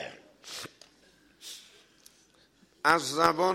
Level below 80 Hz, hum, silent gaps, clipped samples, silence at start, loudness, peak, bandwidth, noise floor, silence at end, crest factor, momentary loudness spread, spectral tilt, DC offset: -70 dBFS; none; none; under 0.1%; 0 s; -27 LUFS; -4 dBFS; 16.5 kHz; -63 dBFS; 0 s; 28 dB; 22 LU; -3 dB/octave; under 0.1%